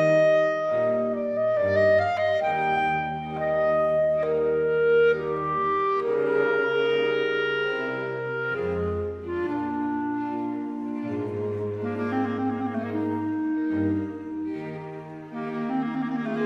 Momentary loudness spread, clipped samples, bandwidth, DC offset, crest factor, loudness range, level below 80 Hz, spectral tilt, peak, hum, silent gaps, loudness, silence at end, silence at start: 10 LU; under 0.1%; 7.8 kHz; under 0.1%; 14 dB; 6 LU; -56 dBFS; -7.5 dB/octave; -12 dBFS; none; none; -25 LUFS; 0 s; 0 s